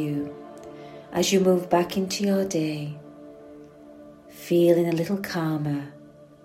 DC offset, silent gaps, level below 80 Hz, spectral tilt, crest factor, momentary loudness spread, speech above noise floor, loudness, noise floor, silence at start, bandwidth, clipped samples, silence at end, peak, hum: under 0.1%; none; -62 dBFS; -5.5 dB/octave; 20 dB; 22 LU; 23 dB; -24 LUFS; -46 dBFS; 0 s; 16 kHz; under 0.1%; 0.2 s; -6 dBFS; none